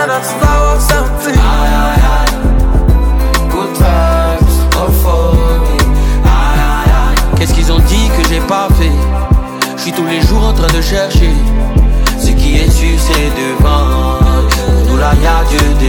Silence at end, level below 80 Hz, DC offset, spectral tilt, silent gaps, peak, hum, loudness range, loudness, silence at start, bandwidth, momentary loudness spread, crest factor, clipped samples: 0 s; -10 dBFS; under 0.1%; -5.5 dB/octave; none; 0 dBFS; none; 1 LU; -11 LUFS; 0 s; 19 kHz; 3 LU; 8 dB; under 0.1%